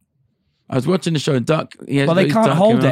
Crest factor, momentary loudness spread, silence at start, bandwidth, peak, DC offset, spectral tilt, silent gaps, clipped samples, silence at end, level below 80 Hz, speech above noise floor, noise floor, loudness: 16 dB; 8 LU; 0.7 s; 14.5 kHz; -2 dBFS; under 0.1%; -6.5 dB/octave; none; under 0.1%; 0 s; -60 dBFS; 49 dB; -65 dBFS; -17 LUFS